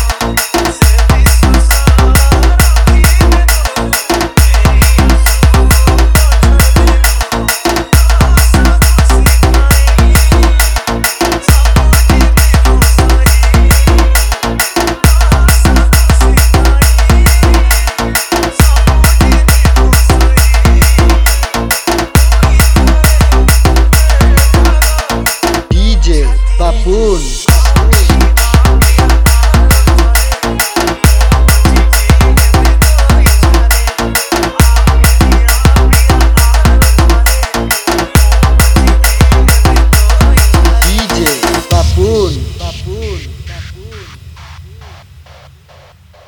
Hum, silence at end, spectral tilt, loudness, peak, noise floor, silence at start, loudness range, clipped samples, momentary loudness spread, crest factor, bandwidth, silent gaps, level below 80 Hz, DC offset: none; 1.4 s; -4.5 dB/octave; -9 LUFS; 0 dBFS; -39 dBFS; 0 s; 2 LU; 0.5%; 5 LU; 6 dB; 19.5 kHz; none; -8 dBFS; under 0.1%